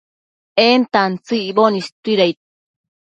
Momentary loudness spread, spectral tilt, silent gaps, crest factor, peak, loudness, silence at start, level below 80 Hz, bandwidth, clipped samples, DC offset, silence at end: 8 LU; -5.5 dB/octave; 1.92-2.03 s; 18 dB; 0 dBFS; -16 LUFS; 0.55 s; -66 dBFS; 8.8 kHz; under 0.1%; under 0.1%; 0.8 s